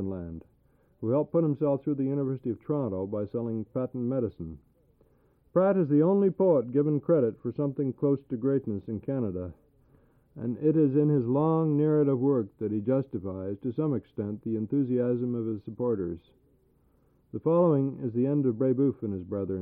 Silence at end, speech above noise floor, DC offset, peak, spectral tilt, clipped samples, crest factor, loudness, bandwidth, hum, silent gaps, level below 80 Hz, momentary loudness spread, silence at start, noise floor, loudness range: 0 s; 38 dB; under 0.1%; -14 dBFS; -13.5 dB/octave; under 0.1%; 14 dB; -28 LUFS; 3.8 kHz; none; none; -62 dBFS; 11 LU; 0 s; -65 dBFS; 6 LU